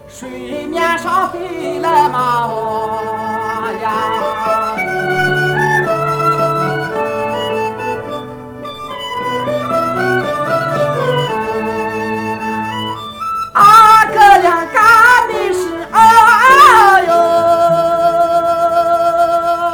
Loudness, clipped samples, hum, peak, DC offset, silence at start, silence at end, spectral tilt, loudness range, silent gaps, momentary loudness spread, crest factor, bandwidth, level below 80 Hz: -12 LUFS; 0.4%; none; 0 dBFS; under 0.1%; 0.05 s; 0 s; -4.5 dB/octave; 10 LU; none; 15 LU; 12 dB; 19 kHz; -46 dBFS